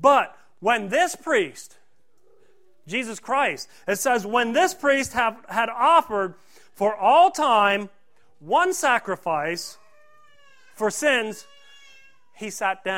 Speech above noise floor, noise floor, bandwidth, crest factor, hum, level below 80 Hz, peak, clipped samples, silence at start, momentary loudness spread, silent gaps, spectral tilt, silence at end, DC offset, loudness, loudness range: 44 dB; -66 dBFS; 16 kHz; 20 dB; none; -64 dBFS; -4 dBFS; under 0.1%; 0 s; 14 LU; none; -2.5 dB/octave; 0 s; 0.3%; -22 LUFS; 6 LU